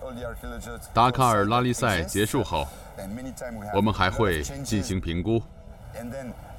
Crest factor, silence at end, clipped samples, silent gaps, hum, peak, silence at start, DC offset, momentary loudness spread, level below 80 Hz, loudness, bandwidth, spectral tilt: 20 dB; 0 s; under 0.1%; none; none; -6 dBFS; 0 s; under 0.1%; 16 LU; -42 dBFS; -25 LUFS; 17 kHz; -5 dB/octave